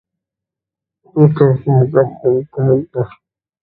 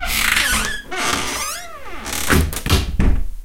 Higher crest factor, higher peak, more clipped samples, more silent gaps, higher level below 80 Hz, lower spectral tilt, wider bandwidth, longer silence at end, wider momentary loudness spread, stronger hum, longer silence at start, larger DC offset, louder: about the same, 16 dB vs 18 dB; about the same, 0 dBFS vs -2 dBFS; neither; neither; second, -52 dBFS vs -24 dBFS; first, -13 dB/octave vs -3 dB/octave; second, 4.2 kHz vs 17 kHz; first, 0.55 s vs 0 s; about the same, 12 LU vs 10 LU; neither; first, 1.15 s vs 0 s; neither; first, -14 LUFS vs -19 LUFS